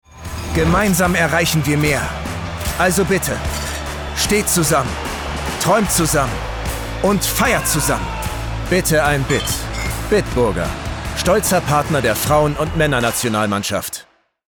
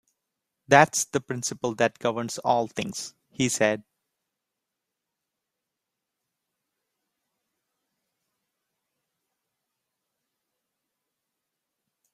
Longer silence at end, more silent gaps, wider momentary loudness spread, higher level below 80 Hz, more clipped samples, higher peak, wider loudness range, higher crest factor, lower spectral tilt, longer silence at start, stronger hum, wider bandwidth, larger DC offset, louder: second, 0.55 s vs 8.35 s; neither; second, 10 LU vs 14 LU; first, -30 dBFS vs -68 dBFS; neither; about the same, -4 dBFS vs -2 dBFS; second, 1 LU vs 7 LU; second, 14 dB vs 28 dB; about the same, -4 dB/octave vs -3.5 dB/octave; second, 0.15 s vs 0.7 s; neither; first, over 20 kHz vs 15.5 kHz; neither; first, -17 LUFS vs -25 LUFS